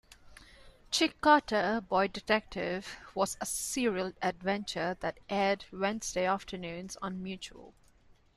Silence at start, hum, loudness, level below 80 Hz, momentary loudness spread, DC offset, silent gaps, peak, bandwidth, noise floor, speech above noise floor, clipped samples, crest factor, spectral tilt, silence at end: 0.25 s; none; -32 LUFS; -60 dBFS; 14 LU; under 0.1%; none; -10 dBFS; 13.5 kHz; -62 dBFS; 30 dB; under 0.1%; 22 dB; -3.5 dB/octave; 0.65 s